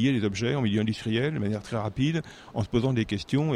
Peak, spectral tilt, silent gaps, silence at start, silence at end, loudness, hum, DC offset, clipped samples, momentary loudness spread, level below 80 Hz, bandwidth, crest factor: -12 dBFS; -6.5 dB/octave; none; 0 s; 0 s; -28 LUFS; none; under 0.1%; under 0.1%; 6 LU; -50 dBFS; 10.5 kHz; 14 dB